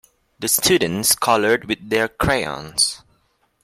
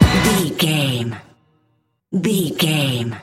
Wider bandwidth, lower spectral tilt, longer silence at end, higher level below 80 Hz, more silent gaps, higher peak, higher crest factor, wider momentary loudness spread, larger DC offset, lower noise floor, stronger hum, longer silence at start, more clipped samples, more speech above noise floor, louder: about the same, 16.5 kHz vs 16.5 kHz; second, -2.5 dB/octave vs -5 dB/octave; first, 0.65 s vs 0 s; second, -46 dBFS vs -34 dBFS; neither; about the same, -2 dBFS vs 0 dBFS; about the same, 18 dB vs 18 dB; second, 7 LU vs 10 LU; neither; about the same, -64 dBFS vs -65 dBFS; neither; first, 0.4 s vs 0 s; neither; about the same, 45 dB vs 46 dB; about the same, -18 LUFS vs -18 LUFS